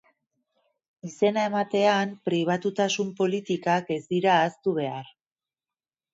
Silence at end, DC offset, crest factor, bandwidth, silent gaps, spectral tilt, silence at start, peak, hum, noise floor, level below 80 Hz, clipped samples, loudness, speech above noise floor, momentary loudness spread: 1.1 s; under 0.1%; 18 dB; 8 kHz; none; -5 dB/octave; 1.05 s; -8 dBFS; none; under -90 dBFS; -74 dBFS; under 0.1%; -25 LUFS; over 65 dB; 7 LU